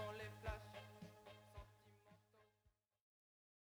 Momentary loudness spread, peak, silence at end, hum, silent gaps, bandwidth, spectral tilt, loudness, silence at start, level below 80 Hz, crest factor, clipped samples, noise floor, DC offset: 12 LU; -34 dBFS; 1.1 s; none; none; over 20 kHz; -5.5 dB/octave; -56 LUFS; 0 s; -66 dBFS; 22 dB; under 0.1%; -83 dBFS; under 0.1%